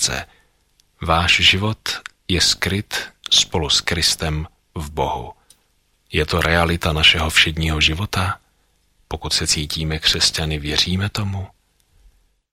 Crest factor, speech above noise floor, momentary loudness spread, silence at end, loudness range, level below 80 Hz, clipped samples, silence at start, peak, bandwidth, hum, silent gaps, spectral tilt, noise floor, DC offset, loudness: 20 dB; 44 dB; 16 LU; 1.05 s; 3 LU; -34 dBFS; under 0.1%; 0 s; 0 dBFS; 16.5 kHz; none; none; -2.5 dB/octave; -63 dBFS; under 0.1%; -17 LUFS